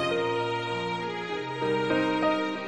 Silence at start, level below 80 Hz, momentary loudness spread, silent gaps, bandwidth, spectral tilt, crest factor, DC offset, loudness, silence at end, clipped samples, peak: 0 s; -66 dBFS; 6 LU; none; 11 kHz; -5.5 dB/octave; 14 dB; under 0.1%; -28 LUFS; 0 s; under 0.1%; -14 dBFS